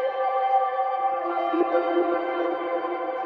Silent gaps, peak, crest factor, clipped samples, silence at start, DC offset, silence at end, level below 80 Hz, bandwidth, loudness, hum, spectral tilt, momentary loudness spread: none; -12 dBFS; 14 dB; under 0.1%; 0 s; under 0.1%; 0 s; -74 dBFS; 5 kHz; -25 LUFS; none; -6 dB/octave; 5 LU